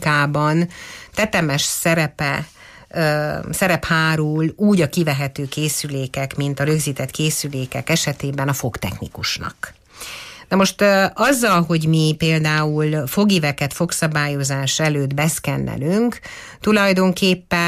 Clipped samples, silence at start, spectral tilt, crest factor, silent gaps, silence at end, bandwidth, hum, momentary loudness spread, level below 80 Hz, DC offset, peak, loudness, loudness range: under 0.1%; 0 s; -4.5 dB/octave; 14 dB; none; 0 s; 15.5 kHz; none; 10 LU; -48 dBFS; under 0.1%; -4 dBFS; -19 LUFS; 4 LU